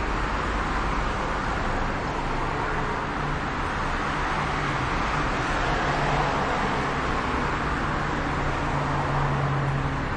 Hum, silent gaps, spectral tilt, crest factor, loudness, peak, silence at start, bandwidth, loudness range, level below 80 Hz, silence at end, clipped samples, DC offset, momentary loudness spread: none; none; -5.5 dB/octave; 14 dB; -26 LUFS; -12 dBFS; 0 s; 10 kHz; 2 LU; -34 dBFS; 0 s; under 0.1%; under 0.1%; 3 LU